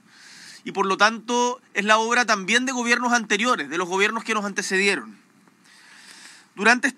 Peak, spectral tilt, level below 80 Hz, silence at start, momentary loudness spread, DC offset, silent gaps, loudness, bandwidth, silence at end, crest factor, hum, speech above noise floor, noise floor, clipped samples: -2 dBFS; -2.5 dB/octave; under -90 dBFS; 0.3 s; 7 LU; under 0.1%; none; -21 LUFS; 14 kHz; 0.05 s; 22 dB; none; 34 dB; -55 dBFS; under 0.1%